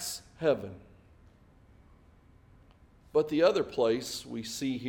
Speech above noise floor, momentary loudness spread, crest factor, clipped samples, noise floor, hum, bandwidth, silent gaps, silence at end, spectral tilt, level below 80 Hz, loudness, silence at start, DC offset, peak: 30 dB; 12 LU; 22 dB; under 0.1%; -59 dBFS; none; 18 kHz; none; 0 s; -4.5 dB/octave; -62 dBFS; -30 LUFS; 0 s; under 0.1%; -12 dBFS